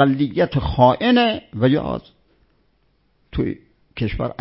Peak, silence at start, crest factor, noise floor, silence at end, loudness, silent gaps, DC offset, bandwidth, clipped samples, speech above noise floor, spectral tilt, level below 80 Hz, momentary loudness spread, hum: 0 dBFS; 0 s; 20 dB; -63 dBFS; 0.1 s; -19 LUFS; none; under 0.1%; 5.8 kHz; under 0.1%; 45 dB; -11.5 dB/octave; -38 dBFS; 15 LU; none